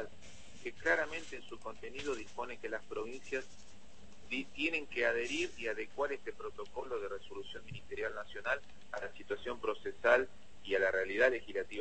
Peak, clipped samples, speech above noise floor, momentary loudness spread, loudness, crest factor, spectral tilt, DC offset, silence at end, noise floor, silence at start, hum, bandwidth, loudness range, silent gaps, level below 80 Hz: -14 dBFS; under 0.1%; 22 dB; 16 LU; -37 LUFS; 24 dB; -3.5 dB/octave; 0.5%; 0 s; -60 dBFS; 0 s; none; 8.4 kHz; 7 LU; none; -64 dBFS